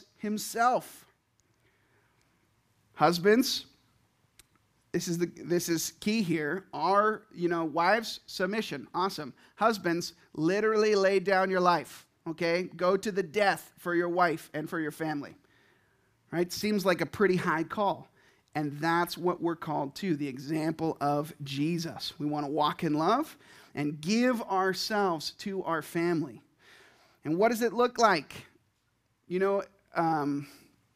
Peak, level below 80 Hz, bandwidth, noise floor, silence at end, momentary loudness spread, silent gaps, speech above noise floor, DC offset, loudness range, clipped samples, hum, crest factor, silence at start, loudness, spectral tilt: -8 dBFS; -70 dBFS; 15.5 kHz; -74 dBFS; 0.45 s; 11 LU; none; 45 dB; under 0.1%; 4 LU; under 0.1%; none; 22 dB; 0.2 s; -29 LUFS; -5 dB/octave